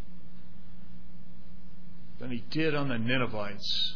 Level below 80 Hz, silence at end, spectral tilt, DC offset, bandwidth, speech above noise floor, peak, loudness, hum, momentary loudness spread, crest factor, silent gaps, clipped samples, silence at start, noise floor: -56 dBFS; 0 s; -5.5 dB/octave; 4%; 5.4 kHz; 21 dB; -14 dBFS; -31 LUFS; none; 24 LU; 20 dB; none; under 0.1%; 0 s; -52 dBFS